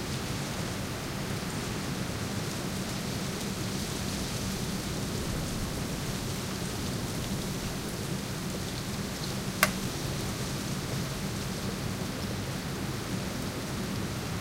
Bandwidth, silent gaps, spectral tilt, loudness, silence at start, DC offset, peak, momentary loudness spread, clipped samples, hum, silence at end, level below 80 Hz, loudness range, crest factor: 16 kHz; none; -4 dB/octave; -33 LUFS; 0 s; under 0.1%; -4 dBFS; 2 LU; under 0.1%; none; 0 s; -46 dBFS; 2 LU; 28 dB